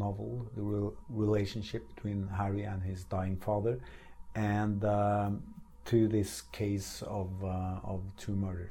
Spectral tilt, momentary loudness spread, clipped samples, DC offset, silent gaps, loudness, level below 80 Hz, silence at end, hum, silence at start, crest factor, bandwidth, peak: -7 dB/octave; 10 LU; under 0.1%; under 0.1%; none; -35 LUFS; -52 dBFS; 0 s; none; 0 s; 18 dB; 16.5 kHz; -16 dBFS